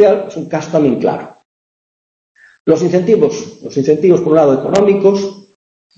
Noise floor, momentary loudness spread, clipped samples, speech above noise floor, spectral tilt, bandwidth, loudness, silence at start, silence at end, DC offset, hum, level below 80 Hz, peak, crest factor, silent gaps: under -90 dBFS; 11 LU; under 0.1%; over 78 dB; -7 dB/octave; 8 kHz; -13 LUFS; 0 s; 0.55 s; under 0.1%; none; -54 dBFS; 0 dBFS; 14 dB; 1.45-2.35 s, 2.60-2.65 s